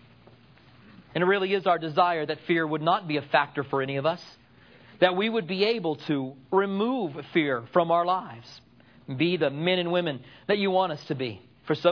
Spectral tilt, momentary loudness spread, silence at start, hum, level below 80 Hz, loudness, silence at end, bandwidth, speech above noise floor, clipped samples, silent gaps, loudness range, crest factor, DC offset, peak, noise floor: -7.5 dB/octave; 9 LU; 1 s; none; -72 dBFS; -26 LUFS; 0 s; 5.4 kHz; 29 dB; under 0.1%; none; 2 LU; 22 dB; under 0.1%; -6 dBFS; -55 dBFS